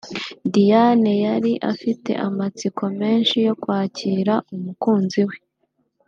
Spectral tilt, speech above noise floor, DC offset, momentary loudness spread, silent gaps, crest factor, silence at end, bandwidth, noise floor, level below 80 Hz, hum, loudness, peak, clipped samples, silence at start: -6.5 dB/octave; 50 dB; under 0.1%; 10 LU; none; 16 dB; 0.7 s; 7.4 kHz; -69 dBFS; -68 dBFS; none; -20 LUFS; -4 dBFS; under 0.1%; 0.05 s